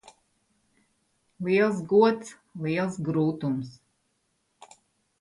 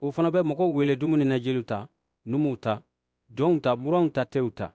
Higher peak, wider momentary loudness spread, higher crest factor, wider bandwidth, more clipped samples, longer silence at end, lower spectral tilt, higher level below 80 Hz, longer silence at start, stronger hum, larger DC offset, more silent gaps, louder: about the same, -8 dBFS vs -10 dBFS; first, 14 LU vs 11 LU; first, 20 dB vs 14 dB; first, 11.5 kHz vs 8 kHz; neither; first, 1.5 s vs 0.05 s; second, -7 dB/octave vs -8.5 dB/octave; second, -68 dBFS vs -62 dBFS; first, 1.4 s vs 0 s; neither; neither; neither; about the same, -26 LUFS vs -26 LUFS